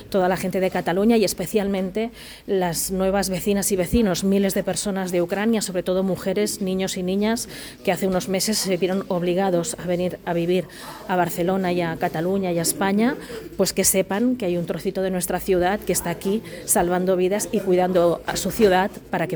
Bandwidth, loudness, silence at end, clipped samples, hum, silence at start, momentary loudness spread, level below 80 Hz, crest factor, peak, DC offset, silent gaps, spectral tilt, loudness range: over 20 kHz; -22 LUFS; 0 s; under 0.1%; none; 0 s; 6 LU; -46 dBFS; 18 dB; -4 dBFS; under 0.1%; none; -4.5 dB/octave; 2 LU